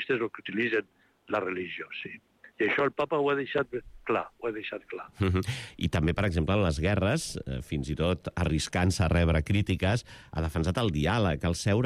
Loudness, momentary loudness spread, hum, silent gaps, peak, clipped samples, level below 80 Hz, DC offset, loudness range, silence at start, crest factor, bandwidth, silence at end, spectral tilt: -29 LUFS; 10 LU; none; none; -16 dBFS; under 0.1%; -42 dBFS; under 0.1%; 3 LU; 0 s; 14 dB; 14 kHz; 0 s; -6 dB/octave